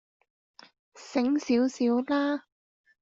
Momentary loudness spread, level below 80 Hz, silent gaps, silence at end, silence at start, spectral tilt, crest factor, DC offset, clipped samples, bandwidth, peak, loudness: 7 LU; -72 dBFS; none; 0.6 s; 0.95 s; -4.5 dB/octave; 16 dB; under 0.1%; under 0.1%; 7.8 kHz; -14 dBFS; -27 LUFS